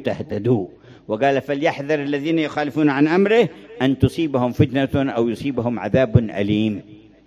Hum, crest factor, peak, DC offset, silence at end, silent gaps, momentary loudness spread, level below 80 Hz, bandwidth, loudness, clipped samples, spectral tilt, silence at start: none; 20 dB; 0 dBFS; under 0.1%; 0.3 s; none; 7 LU; -42 dBFS; 13.5 kHz; -20 LUFS; under 0.1%; -7.5 dB/octave; 0 s